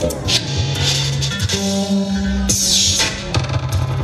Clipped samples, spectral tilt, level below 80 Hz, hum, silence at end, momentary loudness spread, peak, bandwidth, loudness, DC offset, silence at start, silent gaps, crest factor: under 0.1%; -3.5 dB/octave; -30 dBFS; none; 0 s; 8 LU; -2 dBFS; 15.5 kHz; -16 LUFS; under 0.1%; 0 s; none; 16 dB